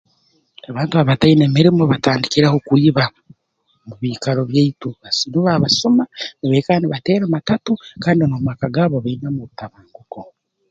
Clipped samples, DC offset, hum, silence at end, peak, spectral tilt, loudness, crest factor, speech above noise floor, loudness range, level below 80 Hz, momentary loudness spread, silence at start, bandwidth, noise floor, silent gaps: under 0.1%; under 0.1%; none; 0.45 s; 0 dBFS; -6 dB/octave; -16 LUFS; 16 dB; 49 dB; 4 LU; -50 dBFS; 14 LU; 0.7 s; 7.8 kHz; -65 dBFS; none